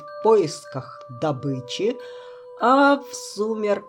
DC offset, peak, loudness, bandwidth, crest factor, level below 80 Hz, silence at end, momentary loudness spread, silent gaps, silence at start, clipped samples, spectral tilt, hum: under 0.1%; -6 dBFS; -21 LUFS; 17.5 kHz; 16 dB; -76 dBFS; 0 s; 20 LU; none; 0 s; under 0.1%; -5 dB/octave; none